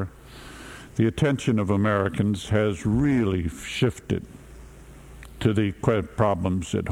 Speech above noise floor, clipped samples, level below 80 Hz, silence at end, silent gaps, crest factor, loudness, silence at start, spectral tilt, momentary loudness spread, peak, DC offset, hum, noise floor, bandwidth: 21 dB; under 0.1%; -44 dBFS; 0 s; none; 20 dB; -24 LUFS; 0 s; -7 dB/octave; 19 LU; -6 dBFS; under 0.1%; none; -45 dBFS; 14 kHz